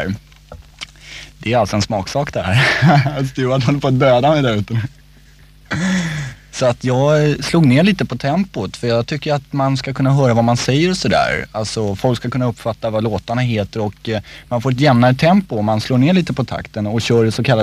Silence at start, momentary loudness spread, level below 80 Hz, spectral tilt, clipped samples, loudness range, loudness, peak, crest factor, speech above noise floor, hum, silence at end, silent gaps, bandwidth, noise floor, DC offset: 0 s; 11 LU; -42 dBFS; -6 dB/octave; under 0.1%; 3 LU; -16 LUFS; 0 dBFS; 16 dB; 29 dB; none; 0 s; none; 13.5 kHz; -45 dBFS; under 0.1%